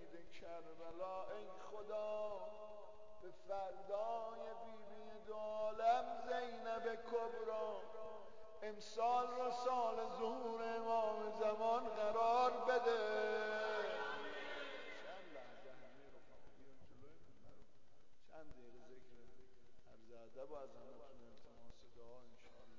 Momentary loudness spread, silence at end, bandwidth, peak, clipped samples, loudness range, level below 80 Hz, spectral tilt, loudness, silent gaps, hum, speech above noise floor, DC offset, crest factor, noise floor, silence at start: 23 LU; 0 s; 7.6 kHz; -26 dBFS; under 0.1%; 21 LU; -76 dBFS; -4 dB/octave; -43 LUFS; none; none; 30 dB; 0.2%; 18 dB; -71 dBFS; 0 s